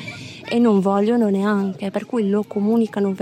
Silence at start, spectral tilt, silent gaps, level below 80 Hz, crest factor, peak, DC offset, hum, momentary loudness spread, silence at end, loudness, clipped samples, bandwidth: 0 s; -7.5 dB/octave; none; -68 dBFS; 12 dB; -6 dBFS; under 0.1%; none; 8 LU; 0 s; -19 LUFS; under 0.1%; 9.6 kHz